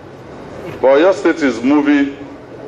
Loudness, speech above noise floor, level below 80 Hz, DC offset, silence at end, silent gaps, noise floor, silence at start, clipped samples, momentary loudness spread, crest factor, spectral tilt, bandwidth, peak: -13 LUFS; 21 dB; -50 dBFS; under 0.1%; 0 s; none; -33 dBFS; 0.05 s; under 0.1%; 21 LU; 12 dB; -5.5 dB/octave; 8.2 kHz; -2 dBFS